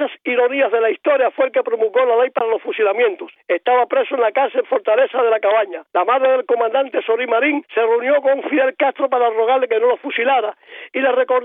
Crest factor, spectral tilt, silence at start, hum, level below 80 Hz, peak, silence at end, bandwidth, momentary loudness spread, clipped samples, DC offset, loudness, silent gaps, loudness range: 12 dB; -6.5 dB/octave; 0 s; none; under -90 dBFS; -4 dBFS; 0 s; 3.9 kHz; 4 LU; under 0.1%; under 0.1%; -17 LUFS; none; 1 LU